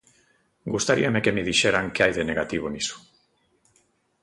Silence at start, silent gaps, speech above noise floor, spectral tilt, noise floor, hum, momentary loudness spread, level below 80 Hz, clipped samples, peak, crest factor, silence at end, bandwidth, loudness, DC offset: 0.65 s; none; 43 dB; -3.5 dB/octave; -66 dBFS; none; 10 LU; -52 dBFS; under 0.1%; -6 dBFS; 20 dB; 1.25 s; 11.5 kHz; -23 LUFS; under 0.1%